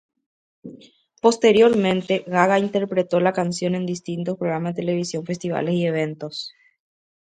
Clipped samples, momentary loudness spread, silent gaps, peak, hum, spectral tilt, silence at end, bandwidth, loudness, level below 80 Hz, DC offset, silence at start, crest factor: under 0.1%; 12 LU; none; -2 dBFS; none; -5.5 dB/octave; 0.75 s; 9.4 kHz; -21 LUFS; -64 dBFS; under 0.1%; 0.65 s; 20 dB